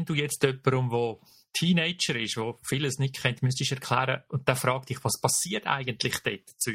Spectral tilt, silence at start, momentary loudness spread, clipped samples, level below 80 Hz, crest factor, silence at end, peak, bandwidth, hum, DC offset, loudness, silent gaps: -4 dB/octave; 0 s; 6 LU; under 0.1%; -62 dBFS; 24 dB; 0 s; -4 dBFS; 16.5 kHz; none; under 0.1%; -28 LUFS; none